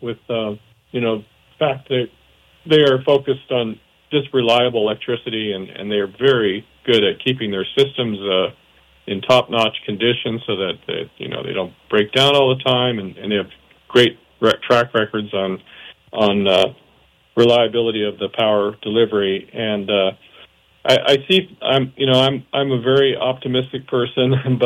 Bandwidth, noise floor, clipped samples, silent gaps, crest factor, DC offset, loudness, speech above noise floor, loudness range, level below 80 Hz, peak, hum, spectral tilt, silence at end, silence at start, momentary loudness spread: 14 kHz; -55 dBFS; under 0.1%; none; 16 dB; under 0.1%; -18 LUFS; 37 dB; 3 LU; -60 dBFS; -4 dBFS; none; -6 dB/octave; 0 s; 0 s; 11 LU